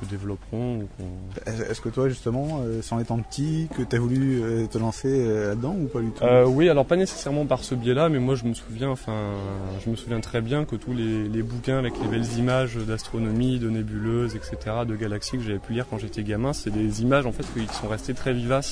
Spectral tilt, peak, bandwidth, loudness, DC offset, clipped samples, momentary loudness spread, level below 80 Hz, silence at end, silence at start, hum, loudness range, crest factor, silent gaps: -6.5 dB/octave; -8 dBFS; 10.5 kHz; -25 LUFS; under 0.1%; under 0.1%; 9 LU; -42 dBFS; 0 s; 0 s; none; 6 LU; 18 dB; none